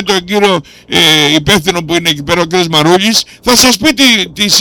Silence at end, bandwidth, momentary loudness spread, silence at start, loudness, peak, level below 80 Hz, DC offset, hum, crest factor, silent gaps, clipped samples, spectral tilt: 0 s; over 20 kHz; 6 LU; 0 s; -8 LUFS; 0 dBFS; -38 dBFS; under 0.1%; none; 10 dB; none; 0.3%; -2.5 dB/octave